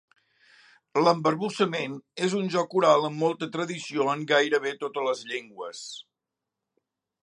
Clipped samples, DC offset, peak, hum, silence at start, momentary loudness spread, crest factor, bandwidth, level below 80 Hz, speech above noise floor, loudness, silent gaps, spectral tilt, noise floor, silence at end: under 0.1%; under 0.1%; -6 dBFS; none; 0.95 s; 14 LU; 22 dB; 11 kHz; -80 dBFS; 61 dB; -26 LUFS; none; -4.5 dB/octave; -87 dBFS; 1.2 s